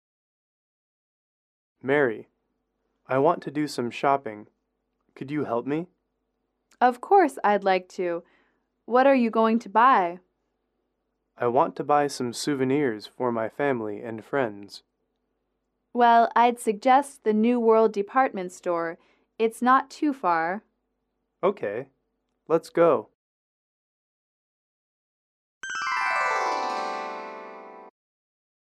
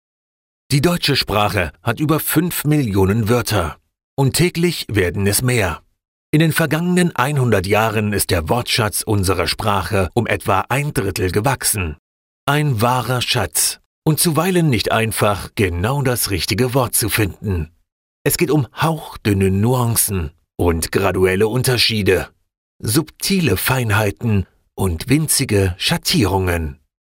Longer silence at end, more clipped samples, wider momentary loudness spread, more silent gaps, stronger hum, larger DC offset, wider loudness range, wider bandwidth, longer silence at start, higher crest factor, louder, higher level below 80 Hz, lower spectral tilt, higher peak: first, 0.85 s vs 0.4 s; neither; first, 15 LU vs 6 LU; first, 23.15-25.61 s vs 4.04-4.17 s, 6.08-6.33 s, 11.99-12.47 s, 13.86-14.02 s, 17.92-18.25 s, 22.58-22.79 s; neither; neither; first, 7 LU vs 2 LU; second, 14 kHz vs 16.5 kHz; first, 1.85 s vs 0.7 s; about the same, 18 dB vs 16 dB; second, -24 LUFS vs -17 LUFS; second, -76 dBFS vs -40 dBFS; about the same, -5.5 dB/octave vs -4.5 dB/octave; second, -8 dBFS vs -2 dBFS